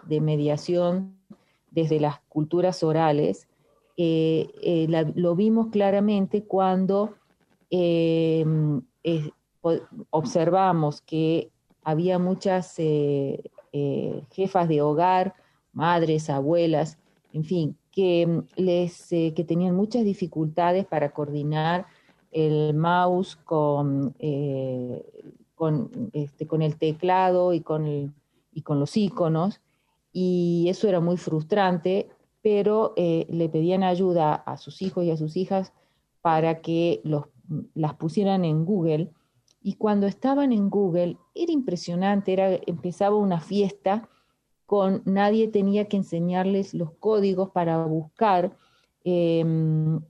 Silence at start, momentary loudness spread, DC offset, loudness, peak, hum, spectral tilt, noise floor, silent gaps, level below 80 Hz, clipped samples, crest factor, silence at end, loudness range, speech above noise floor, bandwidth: 0.05 s; 9 LU; under 0.1%; -24 LUFS; -8 dBFS; none; -8 dB/octave; -70 dBFS; none; -68 dBFS; under 0.1%; 16 dB; 0.05 s; 2 LU; 47 dB; 9.8 kHz